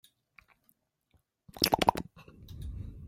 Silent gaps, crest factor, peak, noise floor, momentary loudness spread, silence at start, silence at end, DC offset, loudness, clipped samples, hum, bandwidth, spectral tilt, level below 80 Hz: none; 30 dB; -6 dBFS; -73 dBFS; 22 LU; 1.55 s; 0 s; under 0.1%; -30 LUFS; under 0.1%; none; 16.5 kHz; -3.5 dB/octave; -50 dBFS